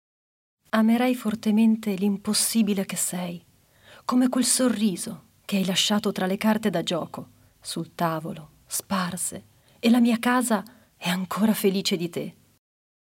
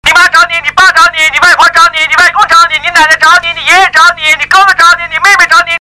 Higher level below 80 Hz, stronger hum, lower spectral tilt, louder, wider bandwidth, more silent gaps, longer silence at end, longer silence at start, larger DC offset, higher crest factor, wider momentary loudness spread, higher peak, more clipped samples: second, -68 dBFS vs -38 dBFS; second, none vs 50 Hz at -40 dBFS; first, -4 dB/octave vs 0.5 dB/octave; second, -24 LUFS vs -4 LUFS; second, 16.5 kHz vs over 20 kHz; neither; first, 0.85 s vs 0 s; first, 0.75 s vs 0.05 s; neither; first, 18 dB vs 6 dB; first, 14 LU vs 3 LU; second, -8 dBFS vs 0 dBFS; second, under 0.1% vs 8%